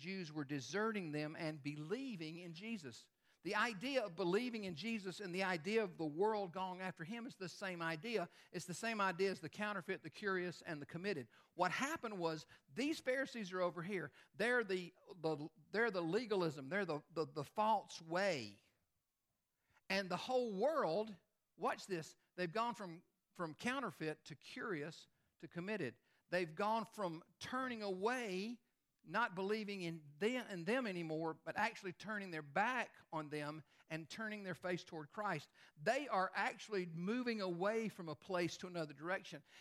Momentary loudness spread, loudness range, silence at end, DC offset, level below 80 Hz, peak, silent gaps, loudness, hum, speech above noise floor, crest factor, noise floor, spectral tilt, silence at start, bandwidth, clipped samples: 11 LU; 4 LU; 0 s; under 0.1%; -88 dBFS; -24 dBFS; none; -43 LUFS; none; 46 dB; 20 dB; -89 dBFS; -5 dB/octave; 0 s; 15 kHz; under 0.1%